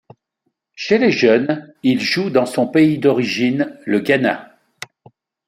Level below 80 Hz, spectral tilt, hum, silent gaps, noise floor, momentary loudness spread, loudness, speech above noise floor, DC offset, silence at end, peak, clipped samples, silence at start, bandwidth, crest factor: -62 dBFS; -6 dB/octave; none; none; -72 dBFS; 15 LU; -16 LUFS; 56 dB; under 0.1%; 1 s; -2 dBFS; under 0.1%; 0.8 s; 15.5 kHz; 16 dB